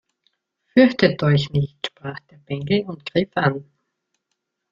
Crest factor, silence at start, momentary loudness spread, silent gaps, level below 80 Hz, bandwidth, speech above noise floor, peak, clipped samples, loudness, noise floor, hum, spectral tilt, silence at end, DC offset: 20 dB; 0.75 s; 18 LU; none; -56 dBFS; 7.4 kHz; 58 dB; -2 dBFS; under 0.1%; -20 LUFS; -77 dBFS; none; -7.5 dB/octave; 1.1 s; under 0.1%